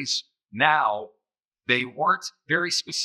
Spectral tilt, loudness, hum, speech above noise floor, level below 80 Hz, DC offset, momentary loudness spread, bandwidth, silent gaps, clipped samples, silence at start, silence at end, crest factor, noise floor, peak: -2 dB/octave; -24 LUFS; none; 59 dB; -84 dBFS; under 0.1%; 12 LU; 15.5 kHz; 1.45-1.51 s; under 0.1%; 0 s; 0 s; 22 dB; -84 dBFS; -4 dBFS